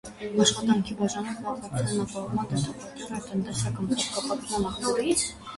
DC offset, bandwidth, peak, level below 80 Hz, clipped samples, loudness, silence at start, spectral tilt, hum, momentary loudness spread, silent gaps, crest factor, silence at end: under 0.1%; 11.5 kHz; -6 dBFS; -52 dBFS; under 0.1%; -28 LUFS; 0.05 s; -4 dB/octave; none; 10 LU; none; 22 dB; 0 s